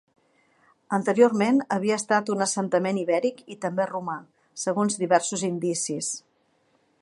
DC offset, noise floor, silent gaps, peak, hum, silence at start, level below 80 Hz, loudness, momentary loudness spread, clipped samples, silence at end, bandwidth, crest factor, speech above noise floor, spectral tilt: under 0.1%; -67 dBFS; none; -4 dBFS; none; 0.9 s; -76 dBFS; -25 LUFS; 12 LU; under 0.1%; 0.8 s; 11.5 kHz; 22 dB; 43 dB; -4.5 dB/octave